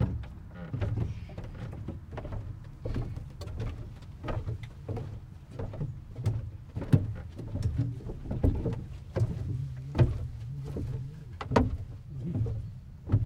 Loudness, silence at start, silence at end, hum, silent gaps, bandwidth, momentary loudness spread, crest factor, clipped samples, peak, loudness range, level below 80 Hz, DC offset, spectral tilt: -35 LUFS; 0 s; 0 s; none; none; 9.4 kHz; 14 LU; 26 dB; under 0.1%; -6 dBFS; 7 LU; -42 dBFS; under 0.1%; -8.5 dB/octave